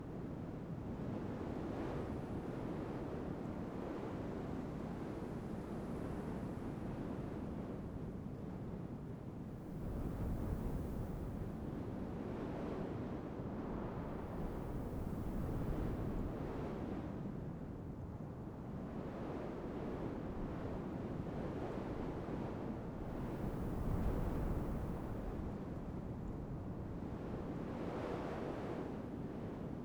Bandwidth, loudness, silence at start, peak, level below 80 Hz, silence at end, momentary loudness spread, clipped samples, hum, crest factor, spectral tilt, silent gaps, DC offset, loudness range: over 20 kHz; -44 LUFS; 0 s; -26 dBFS; -50 dBFS; 0 s; 5 LU; under 0.1%; none; 16 dB; -8.5 dB/octave; none; under 0.1%; 3 LU